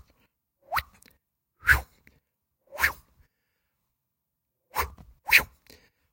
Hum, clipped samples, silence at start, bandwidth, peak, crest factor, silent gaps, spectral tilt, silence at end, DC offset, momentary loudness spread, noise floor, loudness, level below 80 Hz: none; under 0.1%; 0.7 s; 16.5 kHz; -4 dBFS; 28 dB; none; -1.5 dB/octave; 0.65 s; under 0.1%; 22 LU; -82 dBFS; -25 LUFS; -46 dBFS